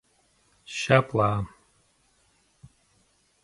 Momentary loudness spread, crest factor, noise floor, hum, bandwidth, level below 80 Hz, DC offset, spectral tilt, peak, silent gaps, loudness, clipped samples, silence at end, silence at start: 15 LU; 26 dB; -66 dBFS; none; 11.5 kHz; -56 dBFS; under 0.1%; -5.5 dB/octave; -2 dBFS; none; -25 LUFS; under 0.1%; 1.95 s; 0.7 s